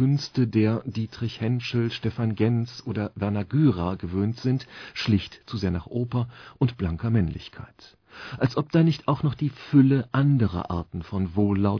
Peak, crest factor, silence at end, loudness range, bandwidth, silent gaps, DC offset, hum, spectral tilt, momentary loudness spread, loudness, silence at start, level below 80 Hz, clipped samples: -8 dBFS; 18 dB; 0 s; 4 LU; 5.4 kHz; none; under 0.1%; none; -8 dB/octave; 10 LU; -25 LUFS; 0 s; -48 dBFS; under 0.1%